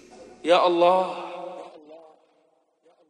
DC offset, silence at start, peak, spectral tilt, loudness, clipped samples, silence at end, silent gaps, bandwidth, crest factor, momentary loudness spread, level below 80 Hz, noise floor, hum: under 0.1%; 0.2 s; -6 dBFS; -5 dB/octave; -21 LUFS; under 0.1%; 1.15 s; none; 10 kHz; 20 dB; 22 LU; -78 dBFS; -66 dBFS; none